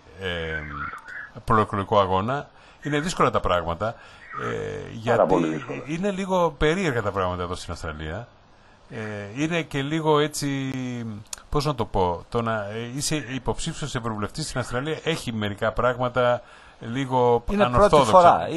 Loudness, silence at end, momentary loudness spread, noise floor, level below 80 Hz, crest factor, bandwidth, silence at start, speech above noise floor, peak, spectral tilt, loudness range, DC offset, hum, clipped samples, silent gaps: -24 LUFS; 0 s; 13 LU; -52 dBFS; -42 dBFS; 22 dB; 12 kHz; 0.1 s; 29 dB; -2 dBFS; -5.5 dB/octave; 3 LU; under 0.1%; none; under 0.1%; none